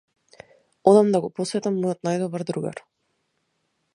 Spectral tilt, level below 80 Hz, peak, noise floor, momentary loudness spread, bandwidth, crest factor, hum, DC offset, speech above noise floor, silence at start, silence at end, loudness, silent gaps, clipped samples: -6.5 dB/octave; -70 dBFS; -2 dBFS; -73 dBFS; 13 LU; 11 kHz; 22 dB; none; under 0.1%; 52 dB; 0.85 s; 1.15 s; -22 LUFS; none; under 0.1%